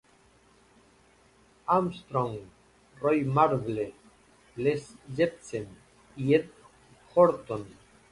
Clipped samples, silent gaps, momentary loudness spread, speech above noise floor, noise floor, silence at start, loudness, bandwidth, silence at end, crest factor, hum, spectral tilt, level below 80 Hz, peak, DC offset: under 0.1%; none; 17 LU; 34 dB; -61 dBFS; 1.7 s; -28 LUFS; 11.5 kHz; 0.4 s; 22 dB; none; -7.5 dB/octave; -62 dBFS; -8 dBFS; under 0.1%